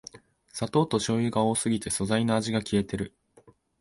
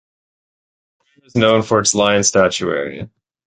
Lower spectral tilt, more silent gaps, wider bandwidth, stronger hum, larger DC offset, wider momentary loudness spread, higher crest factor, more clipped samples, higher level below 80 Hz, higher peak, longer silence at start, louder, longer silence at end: first, -5 dB/octave vs -3.5 dB/octave; neither; first, 11.5 kHz vs 9.6 kHz; neither; neither; second, 10 LU vs 14 LU; about the same, 18 dB vs 18 dB; neither; about the same, -54 dBFS vs -50 dBFS; second, -10 dBFS vs -2 dBFS; second, 0.15 s vs 1.35 s; second, -27 LUFS vs -15 LUFS; first, 0.75 s vs 0.4 s